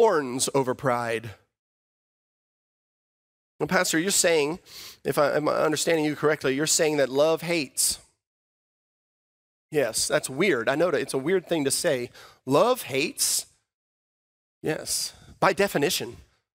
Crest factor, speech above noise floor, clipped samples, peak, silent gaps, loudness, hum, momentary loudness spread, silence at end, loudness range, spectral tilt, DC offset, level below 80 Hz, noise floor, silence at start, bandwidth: 22 dB; over 65 dB; under 0.1%; -6 dBFS; 1.59-3.59 s, 8.27-9.69 s, 13.74-14.61 s; -24 LUFS; none; 11 LU; 0.4 s; 5 LU; -3 dB/octave; under 0.1%; -64 dBFS; under -90 dBFS; 0 s; 16 kHz